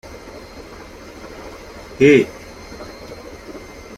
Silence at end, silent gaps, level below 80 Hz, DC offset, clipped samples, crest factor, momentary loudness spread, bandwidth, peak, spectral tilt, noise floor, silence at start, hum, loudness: 0.4 s; none; -46 dBFS; under 0.1%; under 0.1%; 20 dB; 25 LU; 14.5 kHz; -2 dBFS; -6 dB/octave; -37 dBFS; 0.6 s; none; -14 LUFS